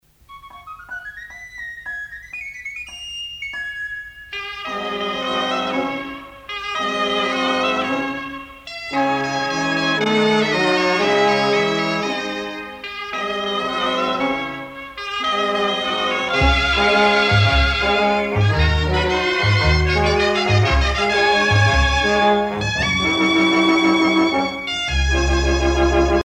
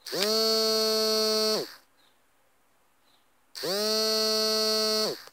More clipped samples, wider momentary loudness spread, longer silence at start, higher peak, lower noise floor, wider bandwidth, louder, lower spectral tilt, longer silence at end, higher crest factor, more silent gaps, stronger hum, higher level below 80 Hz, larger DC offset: neither; first, 15 LU vs 8 LU; first, 0.3 s vs 0.05 s; about the same, -4 dBFS vs -6 dBFS; second, -43 dBFS vs -68 dBFS; second, 11 kHz vs 16 kHz; first, -18 LUFS vs -25 LUFS; first, -5 dB/octave vs -1.5 dB/octave; about the same, 0 s vs 0.05 s; second, 16 dB vs 22 dB; neither; neither; first, -28 dBFS vs -80 dBFS; neither